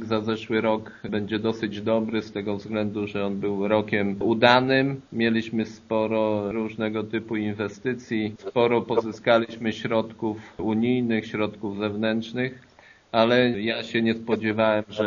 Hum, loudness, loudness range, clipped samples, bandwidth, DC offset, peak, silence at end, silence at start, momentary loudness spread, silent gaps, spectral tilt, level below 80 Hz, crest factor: none; -25 LUFS; 4 LU; under 0.1%; 7.2 kHz; under 0.1%; 0 dBFS; 0 s; 0 s; 9 LU; none; -4 dB/octave; -62 dBFS; 24 dB